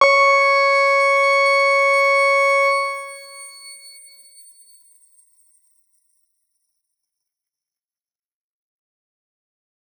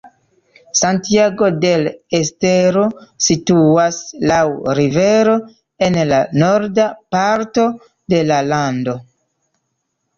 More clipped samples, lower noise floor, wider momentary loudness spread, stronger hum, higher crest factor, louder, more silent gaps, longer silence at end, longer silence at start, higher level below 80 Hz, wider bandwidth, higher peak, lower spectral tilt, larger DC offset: neither; first, under -90 dBFS vs -71 dBFS; first, 22 LU vs 7 LU; neither; first, 20 dB vs 14 dB; about the same, -14 LUFS vs -15 LUFS; neither; first, 6.1 s vs 1.15 s; about the same, 0 s vs 0.05 s; second, under -90 dBFS vs -50 dBFS; first, 19 kHz vs 7.6 kHz; about the same, -2 dBFS vs -2 dBFS; second, 2.5 dB/octave vs -5 dB/octave; neither